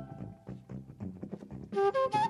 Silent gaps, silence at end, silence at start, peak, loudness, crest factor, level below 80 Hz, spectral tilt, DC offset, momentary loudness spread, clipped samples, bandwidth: none; 0 s; 0 s; -18 dBFS; -35 LUFS; 16 dB; -62 dBFS; -6.5 dB/octave; under 0.1%; 17 LU; under 0.1%; 11.5 kHz